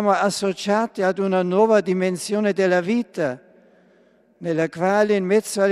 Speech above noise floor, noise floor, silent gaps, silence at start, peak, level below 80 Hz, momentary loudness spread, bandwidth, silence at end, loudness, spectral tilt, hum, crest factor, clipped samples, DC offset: 37 dB; -57 dBFS; none; 0 s; -4 dBFS; -70 dBFS; 8 LU; 14.5 kHz; 0 s; -20 LUFS; -5.5 dB/octave; none; 16 dB; under 0.1%; under 0.1%